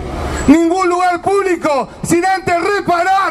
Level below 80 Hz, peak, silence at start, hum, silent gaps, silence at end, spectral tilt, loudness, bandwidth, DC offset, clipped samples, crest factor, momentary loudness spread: -32 dBFS; 0 dBFS; 0 s; none; none; 0 s; -5 dB/octave; -14 LUFS; 14.5 kHz; under 0.1%; 0.1%; 14 dB; 6 LU